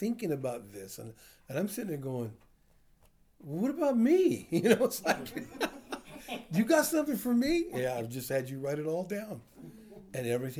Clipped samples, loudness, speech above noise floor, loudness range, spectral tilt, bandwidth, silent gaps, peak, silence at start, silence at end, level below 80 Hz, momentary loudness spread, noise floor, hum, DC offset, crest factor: under 0.1%; -31 LUFS; 33 dB; 8 LU; -5.5 dB/octave; over 20 kHz; none; -12 dBFS; 0 s; 0 s; -62 dBFS; 18 LU; -64 dBFS; none; under 0.1%; 22 dB